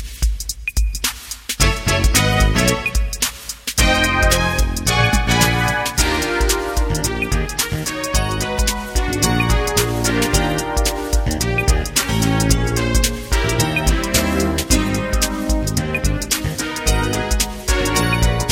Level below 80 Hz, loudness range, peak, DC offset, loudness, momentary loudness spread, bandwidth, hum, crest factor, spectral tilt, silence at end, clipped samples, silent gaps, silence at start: -22 dBFS; 3 LU; 0 dBFS; under 0.1%; -18 LUFS; 6 LU; 17 kHz; none; 16 dB; -3.5 dB/octave; 0 s; under 0.1%; none; 0 s